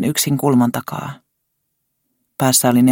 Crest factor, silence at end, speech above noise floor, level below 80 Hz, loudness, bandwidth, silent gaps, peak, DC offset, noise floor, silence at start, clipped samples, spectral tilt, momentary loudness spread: 16 dB; 0 s; 57 dB; -58 dBFS; -16 LUFS; 17 kHz; none; -2 dBFS; under 0.1%; -72 dBFS; 0 s; under 0.1%; -4.5 dB/octave; 17 LU